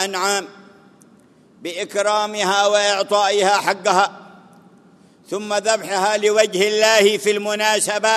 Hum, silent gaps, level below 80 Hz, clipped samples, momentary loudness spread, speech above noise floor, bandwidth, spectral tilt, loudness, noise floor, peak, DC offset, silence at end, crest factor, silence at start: none; none; -76 dBFS; under 0.1%; 10 LU; 33 dB; 13.5 kHz; -1.5 dB/octave; -17 LUFS; -51 dBFS; 0 dBFS; under 0.1%; 0 s; 20 dB; 0 s